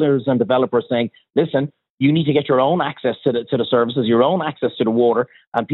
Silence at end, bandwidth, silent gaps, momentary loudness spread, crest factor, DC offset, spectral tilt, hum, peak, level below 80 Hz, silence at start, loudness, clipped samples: 0 s; 4.1 kHz; 1.90-1.98 s, 5.47-5.52 s; 6 LU; 14 dB; under 0.1%; -10 dB/octave; none; -4 dBFS; -64 dBFS; 0 s; -18 LUFS; under 0.1%